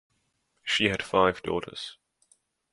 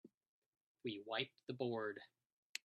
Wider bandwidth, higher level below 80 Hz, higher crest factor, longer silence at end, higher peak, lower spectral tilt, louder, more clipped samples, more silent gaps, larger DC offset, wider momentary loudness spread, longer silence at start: first, 11.5 kHz vs 10 kHz; first, -56 dBFS vs under -90 dBFS; about the same, 24 dB vs 26 dB; first, 0.8 s vs 0.05 s; first, -6 dBFS vs -22 dBFS; about the same, -4 dB/octave vs -4.5 dB/octave; first, -26 LUFS vs -46 LUFS; neither; second, none vs 0.14-0.21 s, 0.28-0.53 s, 0.61-0.75 s, 1.43-1.47 s, 2.32-2.55 s; neither; first, 15 LU vs 11 LU; first, 0.65 s vs 0.05 s